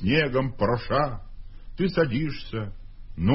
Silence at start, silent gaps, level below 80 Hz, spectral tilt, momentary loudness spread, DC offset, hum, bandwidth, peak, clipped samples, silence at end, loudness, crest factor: 0 s; none; -40 dBFS; -10.5 dB/octave; 17 LU; under 0.1%; none; 5.8 kHz; -8 dBFS; under 0.1%; 0 s; -26 LUFS; 18 dB